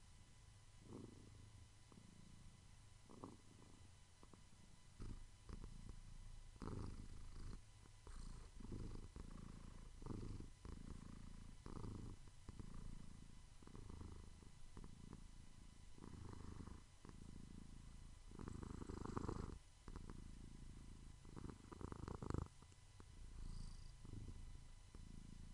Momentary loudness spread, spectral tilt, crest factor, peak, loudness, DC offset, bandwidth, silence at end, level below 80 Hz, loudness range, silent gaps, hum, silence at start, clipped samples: 12 LU; -6 dB/octave; 26 dB; -30 dBFS; -59 LUFS; under 0.1%; 11 kHz; 0 s; -58 dBFS; 8 LU; none; none; 0 s; under 0.1%